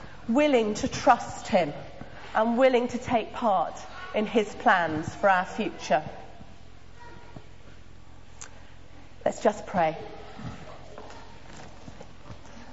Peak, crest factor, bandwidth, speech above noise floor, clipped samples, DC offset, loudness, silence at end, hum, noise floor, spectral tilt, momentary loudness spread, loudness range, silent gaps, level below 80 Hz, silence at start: -6 dBFS; 22 dB; 8 kHz; 25 dB; under 0.1%; 0.7%; -26 LUFS; 0 s; none; -50 dBFS; -5 dB/octave; 24 LU; 10 LU; none; -54 dBFS; 0 s